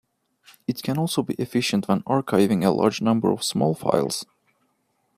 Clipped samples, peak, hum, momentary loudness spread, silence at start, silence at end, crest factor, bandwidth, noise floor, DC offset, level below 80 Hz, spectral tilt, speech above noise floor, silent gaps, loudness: under 0.1%; -4 dBFS; none; 9 LU; 0.7 s; 0.95 s; 20 dB; 15.5 kHz; -70 dBFS; under 0.1%; -64 dBFS; -5.5 dB/octave; 48 dB; none; -23 LUFS